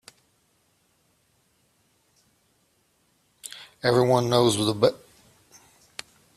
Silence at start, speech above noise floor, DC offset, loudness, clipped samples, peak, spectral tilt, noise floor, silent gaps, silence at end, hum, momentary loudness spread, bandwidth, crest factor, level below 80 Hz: 3.45 s; 47 dB; under 0.1%; -22 LUFS; under 0.1%; -6 dBFS; -5 dB/octave; -67 dBFS; none; 1.4 s; none; 21 LU; 14.5 kHz; 22 dB; -62 dBFS